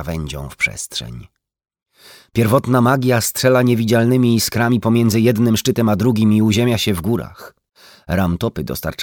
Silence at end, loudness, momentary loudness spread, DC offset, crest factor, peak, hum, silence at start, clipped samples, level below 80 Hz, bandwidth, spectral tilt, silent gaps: 0 s; -16 LUFS; 11 LU; under 0.1%; 14 dB; -2 dBFS; none; 0 s; under 0.1%; -42 dBFS; 20 kHz; -5.5 dB/octave; none